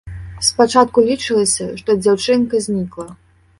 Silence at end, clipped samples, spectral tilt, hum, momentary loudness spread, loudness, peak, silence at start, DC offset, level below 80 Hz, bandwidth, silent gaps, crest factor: 0.45 s; under 0.1%; -3.5 dB/octave; none; 15 LU; -16 LUFS; 0 dBFS; 0.05 s; under 0.1%; -44 dBFS; 11.5 kHz; none; 16 dB